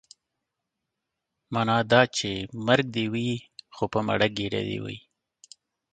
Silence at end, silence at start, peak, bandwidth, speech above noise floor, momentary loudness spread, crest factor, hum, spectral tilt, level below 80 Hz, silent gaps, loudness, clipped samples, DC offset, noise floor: 0.95 s; 1.5 s; -2 dBFS; 9.4 kHz; 59 dB; 14 LU; 24 dB; none; -5 dB/octave; -58 dBFS; none; -26 LUFS; under 0.1%; under 0.1%; -84 dBFS